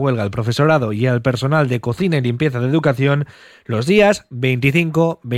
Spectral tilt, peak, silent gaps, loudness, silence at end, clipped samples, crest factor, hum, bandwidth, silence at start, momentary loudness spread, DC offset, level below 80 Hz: -7 dB/octave; -2 dBFS; none; -17 LUFS; 0 s; under 0.1%; 16 dB; none; 14.5 kHz; 0 s; 6 LU; under 0.1%; -48 dBFS